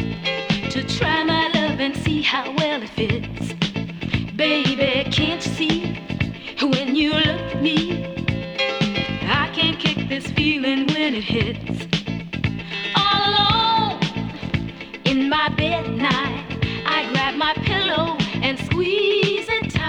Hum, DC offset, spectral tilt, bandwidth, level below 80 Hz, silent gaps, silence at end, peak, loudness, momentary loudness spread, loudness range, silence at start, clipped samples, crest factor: none; under 0.1%; -5.5 dB/octave; 10.5 kHz; -42 dBFS; none; 0 s; -2 dBFS; -20 LUFS; 8 LU; 2 LU; 0 s; under 0.1%; 20 dB